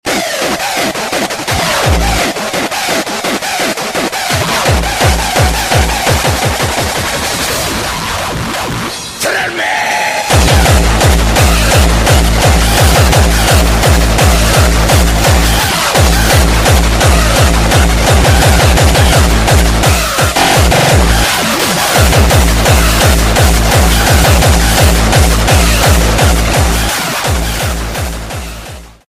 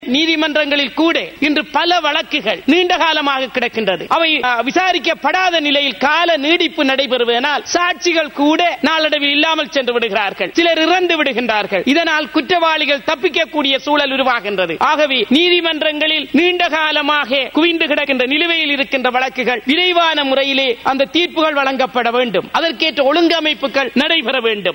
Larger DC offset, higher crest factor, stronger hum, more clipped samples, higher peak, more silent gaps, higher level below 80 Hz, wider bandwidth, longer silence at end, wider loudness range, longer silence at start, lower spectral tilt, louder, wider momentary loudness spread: neither; about the same, 10 dB vs 12 dB; neither; neither; about the same, 0 dBFS vs -2 dBFS; neither; first, -14 dBFS vs -54 dBFS; about the same, 16 kHz vs 16.5 kHz; first, 0.2 s vs 0 s; first, 5 LU vs 1 LU; about the same, 0.05 s vs 0 s; about the same, -4 dB/octave vs -3 dB/octave; first, -10 LUFS vs -14 LUFS; first, 7 LU vs 4 LU